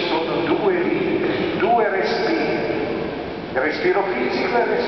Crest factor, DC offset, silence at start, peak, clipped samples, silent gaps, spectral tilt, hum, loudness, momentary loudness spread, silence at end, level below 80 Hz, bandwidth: 12 dB; 0.2%; 0 s; -8 dBFS; under 0.1%; none; -6.5 dB/octave; none; -20 LUFS; 6 LU; 0 s; -50 dBFS; 6.2 kHz